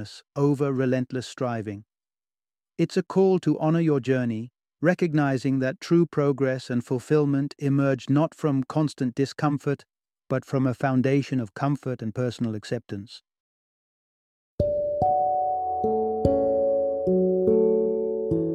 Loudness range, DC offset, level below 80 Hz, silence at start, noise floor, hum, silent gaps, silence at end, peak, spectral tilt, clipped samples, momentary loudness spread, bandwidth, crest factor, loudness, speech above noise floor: 5 LU; under 0.1%; -52 dBFS; 0 s; under -90 dBFS; none; 13.40-14.58 s; 0 s; -6 dBFS; -8 dB/octave; under 0.1%; 9 LU; 11 kHz; 18 dB; -25 LUFS; over 66 dB